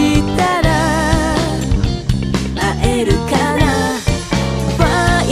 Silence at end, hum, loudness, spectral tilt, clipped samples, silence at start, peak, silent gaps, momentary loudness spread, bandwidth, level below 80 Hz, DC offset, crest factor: 0 s; none; -15 LUFS; -5.5 dB/octave; under 0.1%; 0 s; 0 dBFS; none; 4 LU; 15.5 kHz; -22 dBFS; under 0.1%; 14 dB